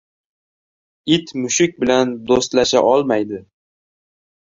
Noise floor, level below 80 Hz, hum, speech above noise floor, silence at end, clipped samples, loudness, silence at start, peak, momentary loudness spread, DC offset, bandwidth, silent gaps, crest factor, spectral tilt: under -90 dBFS; -54 dBFS; none; over 74 dB; 1.1 s; under 0.1%; -17 LUFS; 1.05 s; 0 dBFS; 9 LU; under 0.1%; 7.8 kHz; none; 18 dB; -3.5 dB/octave